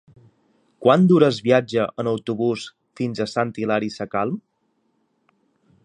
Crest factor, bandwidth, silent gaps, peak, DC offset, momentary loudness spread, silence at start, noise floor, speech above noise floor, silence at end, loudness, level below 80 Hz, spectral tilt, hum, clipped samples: 20 dB; 9.6 kHz; none; -2 dBFS; under 0.1%; 13 LU; 0.8 s; -69 dBFS; 49 dB; 1.45 s; -21 LUFS; -64 dBFS; -7 dB/octave; none; under 0.1%